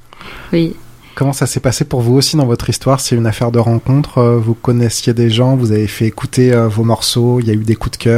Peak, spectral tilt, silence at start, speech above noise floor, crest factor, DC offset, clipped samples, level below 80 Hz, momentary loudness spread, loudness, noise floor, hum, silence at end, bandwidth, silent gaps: 0 dBFS; -6 dB/octave; 0.2 s; 20 dB; 12 dB; under 0.1%; under 0.1%; -36 dBFS; 6 LU; -13 LUFS; -32 dBFS; none; 0 s; 15.5 kHz; none